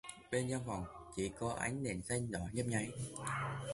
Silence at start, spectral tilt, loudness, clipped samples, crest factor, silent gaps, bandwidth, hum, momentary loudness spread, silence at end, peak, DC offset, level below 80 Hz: 0.05 s; -5 dB/octave; -40 LUFS; under 0.1%; 18 dB; none; 11.5 kHz; none; 5 LU; 0 s; -22 dBFS; under 0.1%; -60 dBFS